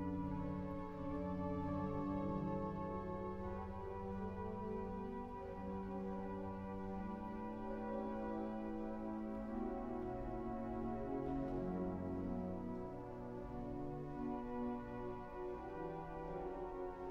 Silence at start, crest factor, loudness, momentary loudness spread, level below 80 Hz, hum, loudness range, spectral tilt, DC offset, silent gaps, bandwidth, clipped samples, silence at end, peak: 0 s; 14 dB; -45 LUFS; 5 LU; -56 dBFS; none; 3 LU; -9.5 dB/octave; under 0.1%; none; 7.2 kHz; under 0.1%; 0 s; -30 dBFS